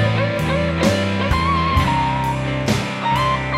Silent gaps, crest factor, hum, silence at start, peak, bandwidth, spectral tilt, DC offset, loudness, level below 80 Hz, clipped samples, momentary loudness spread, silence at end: none; 16 dB; none; 0 s; -2 dBFS; 16 kHz; -6 dB/octave; under 0.1%; -19 LUFS; -30 dBFS; under 0.1%; 3 LU; 0 s